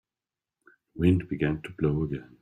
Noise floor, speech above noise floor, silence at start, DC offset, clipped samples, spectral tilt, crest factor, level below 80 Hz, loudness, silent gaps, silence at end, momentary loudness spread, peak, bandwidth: under -90 dBFS; over 63 dB; 0.95 s; under 0.1%; under 0.1%; -9.5 dB/octave; 20 dB; -50 dBFS; -28 LUFS; none; 0.15 s; 8 LU; -10 dBFS; 9.4 kHz